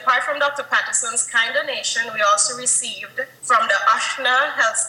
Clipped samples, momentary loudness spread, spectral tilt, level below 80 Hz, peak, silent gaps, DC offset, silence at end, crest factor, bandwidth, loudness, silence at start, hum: under 0.1%; 5 LU; 1.5 dB/octave; -76 dBFS; -4 dBFS; none; under 0.1%; 0 s; 16 dB; 16.5 kHz; -18 LUFS; 0 s; none